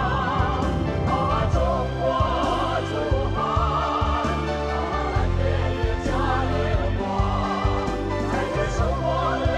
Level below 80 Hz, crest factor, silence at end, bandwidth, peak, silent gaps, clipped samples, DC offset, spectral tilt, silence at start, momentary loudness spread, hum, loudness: -28 dBFS; 14 dB; 0 s; 10.5 kHz; -8 dBFS; none; under 0.1%; under 0.1%; -6.5 dB/octave; 0 s; 3 LU; none; -24 LUFS